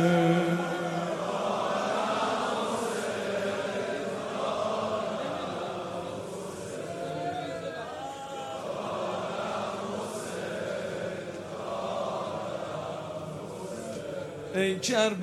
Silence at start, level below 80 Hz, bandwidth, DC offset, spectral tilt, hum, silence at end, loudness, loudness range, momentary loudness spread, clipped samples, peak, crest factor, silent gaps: 0 s; -66 dBFS; 14.5 kHz; under 0.1%; -5 dB/octave; none; 0 s; -32 LUFS; 6 LU; 10 LU; under 0.1%; -12 dBFS; 20 dB; none